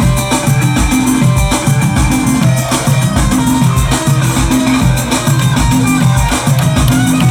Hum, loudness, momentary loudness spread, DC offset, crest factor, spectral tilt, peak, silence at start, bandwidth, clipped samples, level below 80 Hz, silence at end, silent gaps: none; -11 LUFS; 1 LU; under 0.1%; 8 dB; -5 dB/octave; -2 dBFS; 0 s; 18.5 kHz; under 0.1%; -20 dBFS; 0 s; none